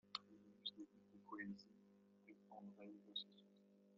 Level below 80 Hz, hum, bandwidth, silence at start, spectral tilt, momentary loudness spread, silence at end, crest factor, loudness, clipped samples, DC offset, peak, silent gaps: under -90 dBFS; 50 Hz at -70 dBFS; 7 kHz; 0.05 s; -1.5 dB/octave; 16 LU; 0 s; 30 dB; -55 LUFS; under 0.1%; under 0.1%; -28 dBFS; none